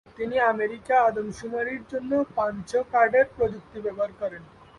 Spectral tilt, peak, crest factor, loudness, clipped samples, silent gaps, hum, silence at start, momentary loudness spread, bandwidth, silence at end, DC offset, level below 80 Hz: -5.5 dB/octave; -8 dBFS; 18 dB; -25 LUFS; under 0.1%; none; none; 0.2 s; 12 LU; 11 kHz; 0.35 s; under 0.1%; -56 dBFS